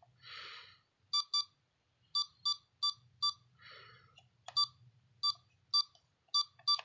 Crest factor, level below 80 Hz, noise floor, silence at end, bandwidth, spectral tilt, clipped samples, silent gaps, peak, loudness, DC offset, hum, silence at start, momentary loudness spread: 18 dB; -84 dBFS; -77 dBFS; 0.05 s; 7.6 kHz; 2 dB/octave; under 0.1%; none; -22 dBFS; -35 LUFS; under 0.1%; none; 0.25 s; 22 LU